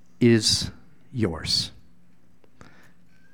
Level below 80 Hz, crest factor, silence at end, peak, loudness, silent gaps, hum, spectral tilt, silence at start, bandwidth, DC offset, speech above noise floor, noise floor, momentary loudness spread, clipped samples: -50 dBFS; 20 dB; 1.65 s; -6 dBFS; -23 LUFS; none; none; -4 dB/octave; 0.2 s; 18.5 kHz; 0.5%; 39 dB; -61 dBFS; 15 LU; under 0.1%